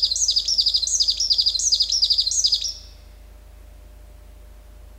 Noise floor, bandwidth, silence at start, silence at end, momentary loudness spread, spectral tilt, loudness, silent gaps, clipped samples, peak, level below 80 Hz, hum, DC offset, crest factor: -44 dBFS; 16 kHz; 0 s; 0 s; 3 LU; 2 dB/octave; -17 LUFS; none; under 0.1%; -6 dBFS; -44 dBFS; none; under 0.1%; 18 dB